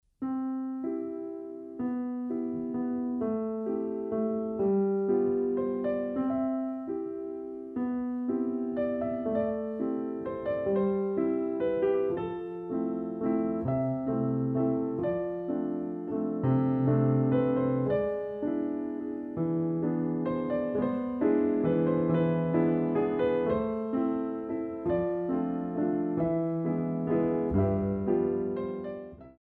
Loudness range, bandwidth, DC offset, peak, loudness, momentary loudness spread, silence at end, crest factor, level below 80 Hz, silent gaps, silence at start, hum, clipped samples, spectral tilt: 4 LU; 4 kHz; under 0.1%; -14 dBFS; -30 LUFS; 8 LU; 0.1 s; 14 dB; -56 dBFS; none; 0.2 s; none; under 0.1%; -12 dB/octave